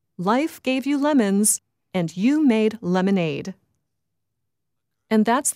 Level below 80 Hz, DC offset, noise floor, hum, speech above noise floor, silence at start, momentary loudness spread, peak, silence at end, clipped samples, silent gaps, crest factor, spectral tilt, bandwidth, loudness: -70 dBFS; under 0.1%; -82 dBFS; none; 61 dB; 0.2 s; 9 LU; -8 dBFS; 0.05 s; under 0.1%; none; 14 dB; -4.5 dB/octave; 16 kHz; -21 LUFS